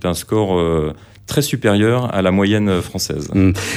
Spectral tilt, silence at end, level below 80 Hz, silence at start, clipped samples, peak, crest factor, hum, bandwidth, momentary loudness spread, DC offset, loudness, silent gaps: -5.5 dB/octave; 0 s; -38 dBFS; 0 s; under 0.1%; -2 dBFS; 14 dB; none; 16 kHz; 7 LU; under 0.1%; -17 LUFS; none